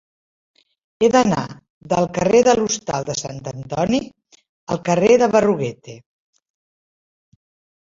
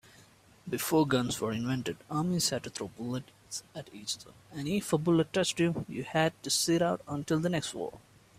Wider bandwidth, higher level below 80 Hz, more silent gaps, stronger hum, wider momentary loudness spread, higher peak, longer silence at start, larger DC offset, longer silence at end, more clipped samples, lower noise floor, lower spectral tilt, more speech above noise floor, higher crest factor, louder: second, 7.8 kHz vs 16 kHz; first, -52 dBFS vs -64 dBFS; first, 1.70-1.81 s, 4.49-4.67 s vs none; neither; first, 16 LU vs 13 LU; first, -2 dBFS vs -12 dBFS; first, 1 s vs 0.65 s; neither; first, 1.85 s vs 0.4 s; neither; first, under -90 dBFS vs -59 dBFS; about the same, -5 dB/octave vs -4.5 dB/octave; first, over 72 dB vs 28 dB; about the same, 18 dB vs 20 dB; first, -18 LUFS vs -31 LUFS